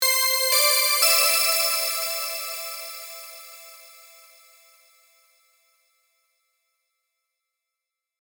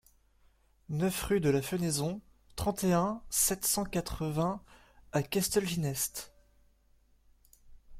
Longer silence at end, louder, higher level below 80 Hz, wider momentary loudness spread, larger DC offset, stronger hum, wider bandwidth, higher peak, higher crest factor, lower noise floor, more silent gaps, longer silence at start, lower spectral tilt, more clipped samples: first, 4.35 s vs 0 s; first, -19 LUFS vs -31 LUFS; second, -84 dBFS vs -52 dBFS; first, 22 LU vs 10 LU; neither; neither; first, over 20 kHz vs 16.5 kHz; first, -6 dBFS vs -14 dBFS; about the same, 20 dB vs 18 dB; first, -86 dBFS vs -66 dBFS; neither; second, 0 s vs 0.9 s; second, 5.5 dB/octave vs -4.5 dB/octave; neither